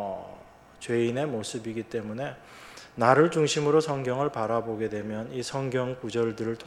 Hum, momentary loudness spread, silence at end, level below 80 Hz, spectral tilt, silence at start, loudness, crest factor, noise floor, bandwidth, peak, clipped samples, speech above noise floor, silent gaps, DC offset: none; 17 LU; 0 s; -64 dBFS; -5.5 dB/octave; 0 s; -27 LUFS; 24 dB; -50 dBFS; 12.5 kHz; -4 dBFS; under 0.1%; 23 dB; none; under 0.1%